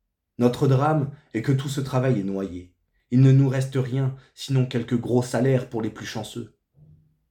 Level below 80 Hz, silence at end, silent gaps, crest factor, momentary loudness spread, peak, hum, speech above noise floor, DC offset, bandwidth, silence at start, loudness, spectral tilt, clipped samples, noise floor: -60 dBFS; 0.85 s; none; 18 dB; 14 LU; -6 dBFS; none; 33 dB; under 0.1%; 12.5 kHz; 0.4 s; -23 LUFS; -7.5 dB/octave; under 0.1%; -55 dBFS